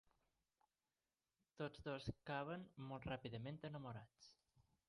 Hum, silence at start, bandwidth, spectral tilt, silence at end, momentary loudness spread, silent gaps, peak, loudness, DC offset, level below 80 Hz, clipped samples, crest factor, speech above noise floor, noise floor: none; 1.55 s; 11 kHz; -7 dB/octave; 0.3 s; 11 LU; none; -34 dBFS; -51 LUFS; under 0.1%; -72 dBFS; under 0.1%; 20 dB; over 39 dB; under -90 dBFS